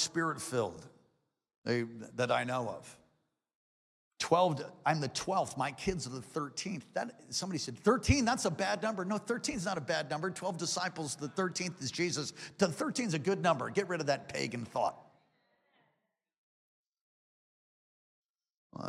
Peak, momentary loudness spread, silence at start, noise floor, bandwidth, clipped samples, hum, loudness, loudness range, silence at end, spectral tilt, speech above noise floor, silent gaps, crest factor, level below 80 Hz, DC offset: -14 dBFS; 10 LU; 0 s; -83 dBFS; 15 kHz; under 0.1%; none; -34 LUFS; 5 LU; 0 s; -4 dB/octave; 49 dB; 1.57-1.62 s, 3.55-4.11 s, 16.38-16.92 s, 17.01-18.34 s, 18.57-18.70 s; 22 dB; -58 dBFS; under 0.1%